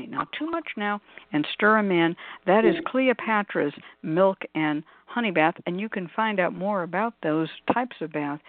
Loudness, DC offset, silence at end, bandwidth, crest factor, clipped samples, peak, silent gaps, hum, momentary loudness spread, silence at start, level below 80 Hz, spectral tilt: -25 LUFS; under 0.1%; 0.1 s; 4.6 kHz; 20 dB; under 0.1%; -6 dBFS; none; none; 10 LU; 0 s; -70 dBFS; -10 dB/octave